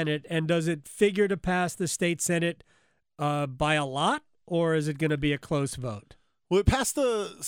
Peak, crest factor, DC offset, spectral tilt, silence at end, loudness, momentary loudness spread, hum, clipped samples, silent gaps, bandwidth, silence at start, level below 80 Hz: -8 dBFS; 18 dB; under 0.1%; -5 dB/octave; 0 s; -27 LUFS; 8 LU; none; under 0.1%; none; 19.5 kHz; 0 s; -44 dBFS